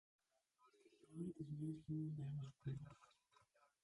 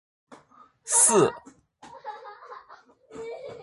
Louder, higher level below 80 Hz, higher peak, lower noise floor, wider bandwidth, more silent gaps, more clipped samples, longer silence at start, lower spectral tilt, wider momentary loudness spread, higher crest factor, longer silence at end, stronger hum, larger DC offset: second, -50 LUFS vs -20 LUFS; second, -78 dBFS vs -70 dBFS; second, -36 dBFS vs -6 dBFS; first, -80 dBFS vs -56 dBFS; about the same, 11 kHz vs 12 kHz; neither; neither; second, 0.6 s vs 0.85 s; first, -9 dB/octave vs -3 dB/octave; second, 12 LU vs 27 LU; second, 16 dB vs 22 dB; first, 0.75 s vs 0.05 s; neither; neither